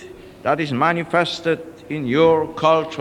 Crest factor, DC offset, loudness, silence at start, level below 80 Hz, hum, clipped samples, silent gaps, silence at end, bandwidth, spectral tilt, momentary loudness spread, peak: 16 dB; under 0.1%; -19 LUFS; 0 s; -54 dBFS; none; under 0.1%; none; 0 s; 11 kHz; -6 dB/octave; 11 LU; -4 dBFS